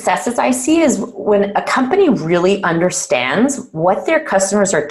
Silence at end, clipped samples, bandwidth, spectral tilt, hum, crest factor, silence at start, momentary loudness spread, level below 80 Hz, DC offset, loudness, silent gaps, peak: 0 s; under 0.1%; 12.5 kHz; -4.5 dB/octave; none; 12 dB; 0 s; 3 LU; -52 dBFS; under 0.1%; -15 LUFS; none; -4 dBFS